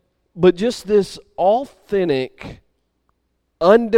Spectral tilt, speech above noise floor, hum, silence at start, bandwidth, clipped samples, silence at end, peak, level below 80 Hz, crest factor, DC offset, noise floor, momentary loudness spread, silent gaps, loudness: -6.5 dB/octave; 53 dB; none; 0.35 s; 13.5 kHz; under 0.1%; 0 s; 0 dBFS; -50 dBFS; 18 dB; under 0.1%; -69 dBFS; 14 LU; none; -18 LUFS